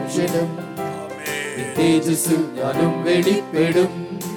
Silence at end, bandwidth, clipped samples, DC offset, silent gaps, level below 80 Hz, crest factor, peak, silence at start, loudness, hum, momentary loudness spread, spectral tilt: 0 s; 19 kHz; under 0.1%; under 0.1%; none; -60 dBFS; 14 dB; -6 dBFS; 0 s; -20 LUFS; none; 11 LU; -5 dB/octave